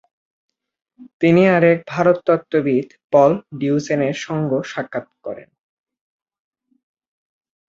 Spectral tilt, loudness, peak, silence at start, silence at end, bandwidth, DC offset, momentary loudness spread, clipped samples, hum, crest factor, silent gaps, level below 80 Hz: -7 dB/octave; -18 LUFS; -2 dBFS; 1 s; 2.35 s; 7.6 kHz; under 0.1%; 15 LU; under 0.1%; none; 18 dB; 1.13-1.20 s, 3.04-3.10 s; -62 dBFS